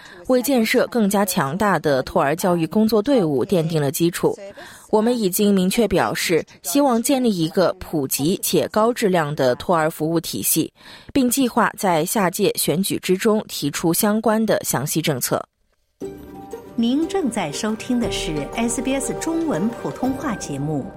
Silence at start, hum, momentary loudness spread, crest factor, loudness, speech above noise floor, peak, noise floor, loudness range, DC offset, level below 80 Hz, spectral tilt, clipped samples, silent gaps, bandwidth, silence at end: 0 s; none; 7 LU; 14 dB; -20 LUFS; 46 dB; -6 dBFS; -66 dBFS; 4 LU; under 0.1%; -48 dBFS; -4.5 dB/octave; under 0.1%; none; 16.5 kHz; 0 s